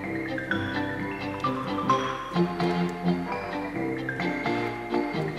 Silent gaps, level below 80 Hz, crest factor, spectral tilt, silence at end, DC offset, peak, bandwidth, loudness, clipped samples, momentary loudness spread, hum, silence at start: none; -54 dBFS; 18 dB; -6.5 dB/octave; 0 s; under 0.1%; -10 dBFS; 13 kHz; -28 LUFS; under 0.1%; 5 LU; none; 0 s